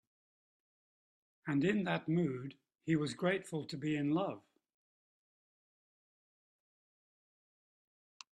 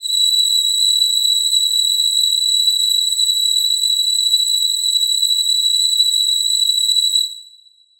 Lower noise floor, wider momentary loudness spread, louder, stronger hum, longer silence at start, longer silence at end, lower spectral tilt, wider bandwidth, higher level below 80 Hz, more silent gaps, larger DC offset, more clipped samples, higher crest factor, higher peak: first, under -90 dBFS vs -49 dBFS; first, 14 LU vs 2 LU; second, -36 LUFS vs -13 LUFS; neither; first, 1.45 s vs 0 s; first, 3.95 s vs 0.55 s; first, -6.5 dB/octave vs 7 dB/octave; second, 12 kHz vs over 20 kHz; second, -78 dBFS vs -66 dBFS; neither; neither; neither; first, 20 dB vs 12 dB; second, -20 dBFS vs -4 dBFS